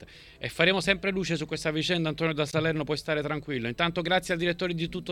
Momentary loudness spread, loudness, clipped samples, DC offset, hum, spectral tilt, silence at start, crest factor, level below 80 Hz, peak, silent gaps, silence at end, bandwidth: 7 LU; -28 LUFS; under 0.1%; under 0.1%; none; -5 dB/octave; 0 s; 22 dB; -52 dBFS; -6 dBFS; none; 0 s; 15.5 kHz